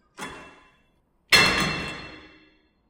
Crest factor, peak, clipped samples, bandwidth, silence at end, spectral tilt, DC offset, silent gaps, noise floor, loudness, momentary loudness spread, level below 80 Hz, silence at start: 22 dB; -4 dBFS; under 0.1%; 16.5 kHz; 0.7 s; -2 dB/octave; under 0.1%; none; -66 dBFS; -20 LUFS; 24 LU; -50 dBFS; 0.2 s